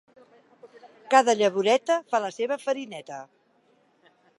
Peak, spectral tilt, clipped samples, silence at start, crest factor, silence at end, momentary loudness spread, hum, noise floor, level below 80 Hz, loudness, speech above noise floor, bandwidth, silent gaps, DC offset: -4 dBFS; -3 dB/octave; under 0.1%; 0.65 s; 24 dB; 1.15 s; 18 LU; none; -64 dBFS; -84 dBFS; -24 LUFS; 40 dB; 11.5 kHz; none; under 0.1%